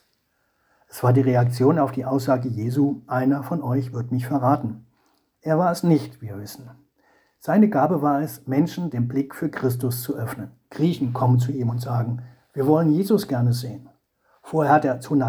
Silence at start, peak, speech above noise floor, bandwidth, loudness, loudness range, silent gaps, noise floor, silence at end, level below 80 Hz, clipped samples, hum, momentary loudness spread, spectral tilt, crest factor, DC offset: 0.95 s; -4 dBFS; 48 dB; over 20 kHz; -22 LUFS; 3 LU; none; -69 dBFS; 0 s; -64 dBFS; under 0.1%; none; 16 LU; -8 dB/octave; 18 dB; under 0.1%